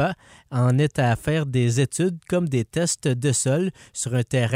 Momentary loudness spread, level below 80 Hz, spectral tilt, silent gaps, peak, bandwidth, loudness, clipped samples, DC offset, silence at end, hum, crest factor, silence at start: 6 LU; -52 dBFS; -5.5 dB/octave; none; -10 dBFS; 15.5 kHz; -23 LUFS; under 0.1%; under 0.1%; 0 s; none; 14 dB; 0 s